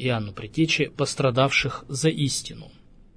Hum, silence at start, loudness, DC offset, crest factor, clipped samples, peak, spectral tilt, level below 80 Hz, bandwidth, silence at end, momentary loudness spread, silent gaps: none; 0 s; -24 LUFS; under 0.1%; 20 dB; under 0.1%; -6 dBFS; -4.5 dB/octave; -50 dBFS; 11 kHz; 0.45 s; 10 LU; none